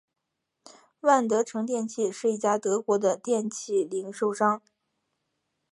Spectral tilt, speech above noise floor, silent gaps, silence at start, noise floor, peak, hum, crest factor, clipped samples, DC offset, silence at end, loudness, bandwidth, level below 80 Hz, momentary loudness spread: -4.5 dB/octave; 54 dB; none; 1.05 s; -80 dBFS; -8 dBFS; none; 20 dB; under 0.1%; under 0.1%; 1.15 s; -27 LUFS; 11.5 kHz; -82 dBFS; 7 LU